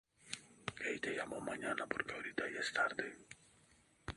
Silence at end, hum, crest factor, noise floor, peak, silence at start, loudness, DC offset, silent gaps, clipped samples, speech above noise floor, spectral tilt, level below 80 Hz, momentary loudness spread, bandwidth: 0 s; none; 24 dB; -70 dBFS; -20 dBFS; 0.2 s; -41 LUFS; under 0.1%; none; under 0.1%; 29 dB; -3 dB/octave; -68 dBFS; 15 LU; 11.5 kHz